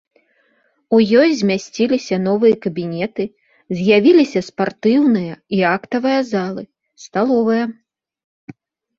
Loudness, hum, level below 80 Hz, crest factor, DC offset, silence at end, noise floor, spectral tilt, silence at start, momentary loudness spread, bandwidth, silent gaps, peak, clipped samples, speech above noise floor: -17 LUFS; none; -60 dBFS; 16 dB; under 0.1%; 1.25 s; -61 dBFS; -6 dB/octave; 0.9 s; 11 LU; 7.6 kHz; none; -2 dBFS; under 0.1%; 46 dB